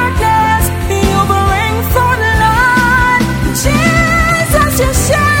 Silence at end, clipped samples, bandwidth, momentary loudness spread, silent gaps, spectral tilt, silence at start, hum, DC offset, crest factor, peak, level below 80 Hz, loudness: 0 s; under 0.1%; 17 kHz; 4 LU; none; -4.5 dB/octave; 0 s; none; under 0.1%; 10 dB; 0 dBFS; -20 dBFS; -11 LUFS